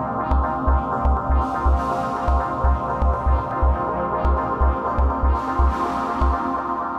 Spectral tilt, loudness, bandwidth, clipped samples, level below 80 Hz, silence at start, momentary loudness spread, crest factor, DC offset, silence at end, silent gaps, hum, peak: -8.5 dB/octave; -22 LUFS; 6 kHz; under 0.1%; -22 dBFS; 0 s; 2 LU; 14 dB; under 0.1%; 0 s; none; none; -6 dBFS